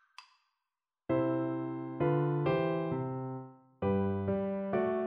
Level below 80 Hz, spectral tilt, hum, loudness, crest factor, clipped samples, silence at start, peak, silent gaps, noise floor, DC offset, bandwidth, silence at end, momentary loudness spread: -66 dBFS; -10 dB/octave; none; -33 LUFS; 14 dB; under 0.1%; 0.2 s; -20 dBFS; none; under -90 dBFS; under 0.1%; 5.8 kHz; 0 s; 10 LU